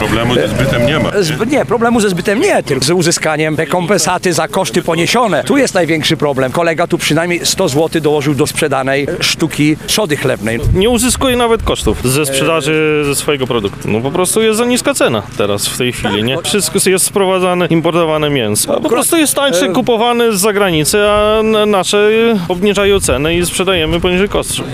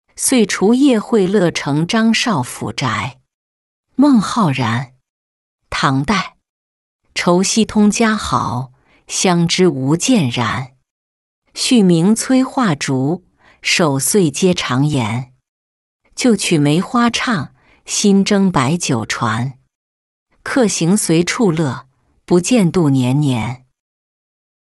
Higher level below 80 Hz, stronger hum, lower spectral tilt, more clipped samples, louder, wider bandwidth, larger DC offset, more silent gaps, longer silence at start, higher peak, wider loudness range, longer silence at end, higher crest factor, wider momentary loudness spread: first, -32 dBFS vs -48 dBFS; neither; about the same, -4 dB/octave vs -4.5 dB/octave; neither; first, -12 LUFS vs -15 LUFS; first, 16 kHz vs 12 kHz; first, 0.5% vs under 0.1%; second, none vs 3.34-3.83 s, 5.09-5.59 s, 6.49-6.99 s, 10.91-11.42 s, 15.49-16.00 s, 19.75-20.26 s; second, 0 s vs 0.2 s; about the same, 0 dBFS vs -2 dBFS; about the same, 2 LU vs 3 LU; second, 0 s vs 1.15 s; about the same, 12 dB vs 14 dB; second, 4 LU vs 12 LU